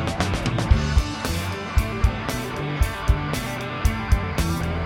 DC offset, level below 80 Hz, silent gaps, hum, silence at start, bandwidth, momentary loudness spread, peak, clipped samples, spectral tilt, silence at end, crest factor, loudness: under 0.1%; -26 dBFS; none; none; 0 s; 17 kHz; 6 LU; -4 dBFS; under 0.1%; -5.5 dB/octave; 0 s; 18 dB; -24 LUFS